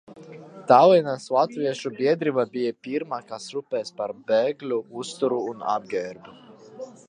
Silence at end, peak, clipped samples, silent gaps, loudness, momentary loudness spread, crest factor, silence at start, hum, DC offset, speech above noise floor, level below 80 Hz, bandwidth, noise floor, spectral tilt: 0.15 s; -2 dBFS; under 0.1%; none; -24 LUFS; 20 LU; 22 dB; 0.1 s; none; under 0.1%; 20 dB; -76 dBFS; 10 kHz; -43 dBFS; -5.5 dB/octave